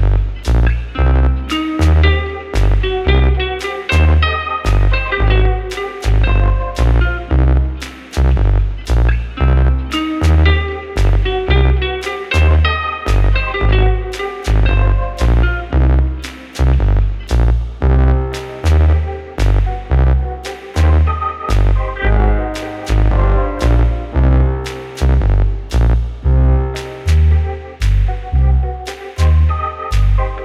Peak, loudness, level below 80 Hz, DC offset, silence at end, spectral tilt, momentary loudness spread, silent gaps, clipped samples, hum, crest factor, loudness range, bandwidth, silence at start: 0 dBFS; -15 LUFS; -14 dBFS; under 0.1%; 0 s; -6.5 dB/octave; 8 LU; none; under 0.1%; none; 12 dB; 1 LU; 10.5 kHz; 0 s